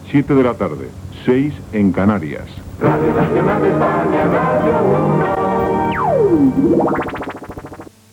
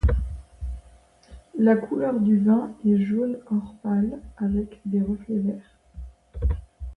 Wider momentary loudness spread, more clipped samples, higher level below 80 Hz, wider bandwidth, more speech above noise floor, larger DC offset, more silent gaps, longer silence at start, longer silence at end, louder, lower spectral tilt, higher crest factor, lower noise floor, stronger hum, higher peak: about the same, 15 LU vs 17 LU; neither; second, -42 dBFS vs -34 dBFS; first, 16.5 kHz vs 3.3 kHz; second, 20 dB vs 30 dB; neither; neither; about the same, 0 s vs 0.05 s; first, 0.3 s vs 0.05 s; first, -15 LUFS vs -24 LUFS; second, -8.5 dB/octave vs -10.5 dB/octave; about the same, 16 dB vs 16 dB; second, -35 dBFS vs -53 dBFS; neither; first, 0 dBFS vs -8 dBFS